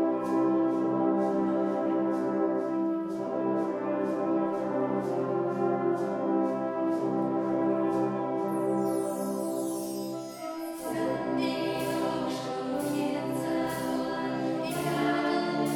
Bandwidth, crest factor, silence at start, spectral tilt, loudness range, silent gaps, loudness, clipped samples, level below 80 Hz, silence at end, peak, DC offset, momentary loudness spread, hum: 18 kHz; 14 dB; 0 s; -6 dB/octave; 3 LU; none; -29 LUFS; under 0.1%; -68 dBFS; 0 s; -14 dBFS; under 0.1%; 5 LU; none